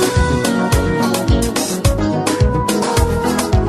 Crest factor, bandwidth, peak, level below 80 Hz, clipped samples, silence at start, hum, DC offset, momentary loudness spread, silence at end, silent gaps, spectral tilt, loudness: 14 dB; 13.5 kHz; 0 dBFS; -22 dBFS; under 0.1%; 0 s; none; under 0.1%; 2 LU; 0 s; none; -5 dB/octave; -16 LUFS